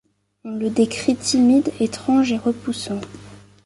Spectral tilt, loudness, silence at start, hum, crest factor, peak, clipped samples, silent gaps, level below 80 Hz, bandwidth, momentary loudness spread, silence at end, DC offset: -4.5 dB/octave; -20 LUFS; 0.45 s; 50 Hz at -40 dBFS; 16 dB; -4 dBFS; under 0.1%; none; -54 dBFS; 11.5 kHz; 15 LU; 0.25 s; under 0.1%